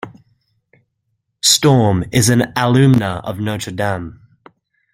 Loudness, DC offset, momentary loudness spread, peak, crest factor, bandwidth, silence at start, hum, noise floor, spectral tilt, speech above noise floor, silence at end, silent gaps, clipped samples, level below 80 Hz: -15 LUFS; under 0.1%; 11 LU; 0 dBFS; 16 dB; 16.5 kHz; 0.05 s; none; -70 dBFS; -4.5 dB/octave; 56 dB; 0.8 s; none; under 0.1%; -48 dBFS